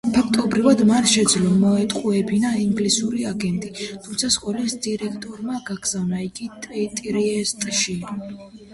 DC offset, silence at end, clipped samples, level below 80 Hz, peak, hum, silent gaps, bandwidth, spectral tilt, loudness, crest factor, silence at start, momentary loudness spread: under 0.1%; 0 s; under 0.1%; -52 dBFS; -4 dBFS; none; none; 11.5 kHz; -4 dB/octave; -21 LUFS; 18 dB; 0.05 s; 15 LU